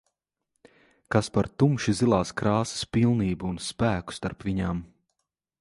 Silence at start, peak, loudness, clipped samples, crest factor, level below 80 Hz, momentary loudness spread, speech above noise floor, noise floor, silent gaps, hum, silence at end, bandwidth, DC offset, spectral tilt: 1.1 s; -8 dBFS; -26 LUFS; under 0.1%; 20 dB; -48 dBFS; 8 LU; 56 dB; -82 dBFS; none; none; 0.75 s; 11.5 kHz; under 0.1%; -6 dB/octave